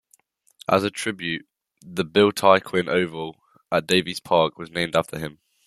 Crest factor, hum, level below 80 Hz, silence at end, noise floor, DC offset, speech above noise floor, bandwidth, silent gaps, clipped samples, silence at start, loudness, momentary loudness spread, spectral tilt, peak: 22 dB; none; -60 dBFS; 0.35 s; -62 dBFS; under 0.1%; 40 dB; 14.5 kHz; none; under 0.1%; 0.7 s; -22 LUFS; 15 LU; -4.5 dB/octave; -2 dBFS